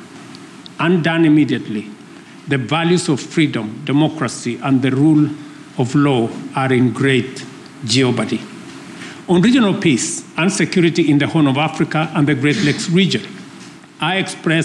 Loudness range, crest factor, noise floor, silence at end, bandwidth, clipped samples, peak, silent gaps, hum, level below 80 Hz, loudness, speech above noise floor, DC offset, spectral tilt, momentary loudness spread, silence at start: 3 LU; 12 dB; -38 dBFS; 0 s; 11.5 kHz; under 0.1%; -4 dBFS; none; none; -56 dBFS; -16 LUFS; 22 dB; under 0.1%; -5.5 dB/octave; 19 LU; 0 s